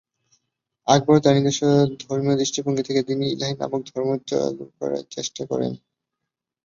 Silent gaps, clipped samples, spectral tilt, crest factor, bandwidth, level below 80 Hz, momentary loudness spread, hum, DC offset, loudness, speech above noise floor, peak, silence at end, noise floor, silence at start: none; under 0.1%; -5.5 dB/octave; 20 dB; 7.6 kHz; -62 dBFS; 13 LU; none; under 0.1%; -22 LUFS; 62 dB; -2 dBFS; 0.9 s; -83 dBFS; 0.85 s